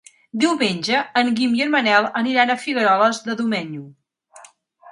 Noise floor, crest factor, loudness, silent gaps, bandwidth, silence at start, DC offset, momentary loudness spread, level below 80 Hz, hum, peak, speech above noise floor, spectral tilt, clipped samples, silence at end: -48 dBFS; 18 dB; -18 LUFS; none; 11.5 kHz; 0.35 s; under 0.1%; 8 LU; -70 dBFS; none; -2 dBFS; 29 dB; -4 dB/octave; under 0.1%; 0 s